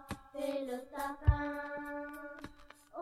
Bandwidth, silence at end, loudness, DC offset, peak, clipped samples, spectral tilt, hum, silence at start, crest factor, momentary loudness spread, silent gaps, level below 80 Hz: 16 kHz; 0 s; -38 LUFS; under 0.1%; -14 dBFS; under 0.1%; -7 dB/octave; none; 0 s; 24 dB; 17 LU; none; -42 dBFS